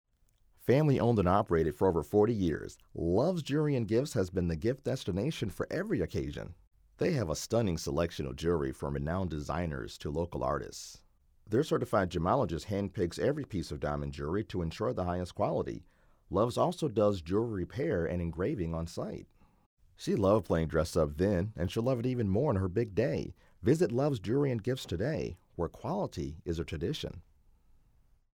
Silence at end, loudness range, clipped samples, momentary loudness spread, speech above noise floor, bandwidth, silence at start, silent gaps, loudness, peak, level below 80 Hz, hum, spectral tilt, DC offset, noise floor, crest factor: 1.1 s; 5 LU; under 0.1%; 10 LU; 37 dB; 18.5 kHz; 0.6 s; 6.67-6.71 s, 19.66-19.77 s; -32 LUFS; -14 dBFS; -50 dBFS; none; -7 dB/octave; under 0.1%; -68 dBFS; 18 dB